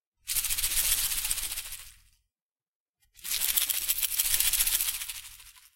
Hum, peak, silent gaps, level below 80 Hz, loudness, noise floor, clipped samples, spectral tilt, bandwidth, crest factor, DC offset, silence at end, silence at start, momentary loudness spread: none; -6 dBFS; 2.42-2.56 s, 2.68-2.93 s; -48 dBFS; -26 LUFS; under -90 dBFS; under 0.1%; 2.5 dB/octave; 17 kHz; 26 dB; under 0.1%; 0.15 s; 0.25 s; 17 LU